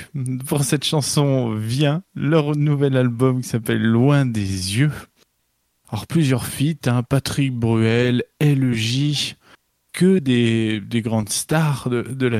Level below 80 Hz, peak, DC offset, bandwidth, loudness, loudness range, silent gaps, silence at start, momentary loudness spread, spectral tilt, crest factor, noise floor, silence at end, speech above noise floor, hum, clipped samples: -52 dBFS; -2 dBFS; under 0.1%; 15.5 kHz; -19 LUFS; 2 LU; none; 0 s; 6 LU; -5.5 dB/octave; 16 dB; -69 dBFS; 0 s; 50 dB; none; under 0.1%